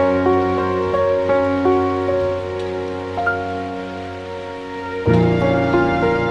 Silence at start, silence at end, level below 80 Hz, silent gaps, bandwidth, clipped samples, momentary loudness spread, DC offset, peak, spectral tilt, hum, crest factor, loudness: 0 s; 0 s; -42 dBFS; none; 9.4 kHz; under 0.1%; 12 LU; under 0.1%; -2 dBFS; -8 dB/octave; none; 16 dB; -19 LUFS